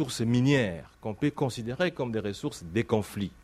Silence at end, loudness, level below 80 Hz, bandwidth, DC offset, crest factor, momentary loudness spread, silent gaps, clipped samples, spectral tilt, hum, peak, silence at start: 0.15 s; -29 LUFS; -56 dBFS; 15 kHz; under 0.1%; 18 dB; 11 LU; none; under 0.1%; -6 dB/octave; none; -10 dBFS; 0 s